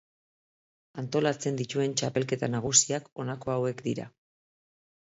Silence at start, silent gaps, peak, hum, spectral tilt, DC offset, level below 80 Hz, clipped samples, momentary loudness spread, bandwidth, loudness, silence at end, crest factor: 0.95 s; 3.12-3.16 s; -6 dBFS; none; -3.5 dB/octave; under 0.1%; -66 dBFS; under 0.1%; 15 LU; 8 kHz; -28 LUFS; 1.05 s; 24 dB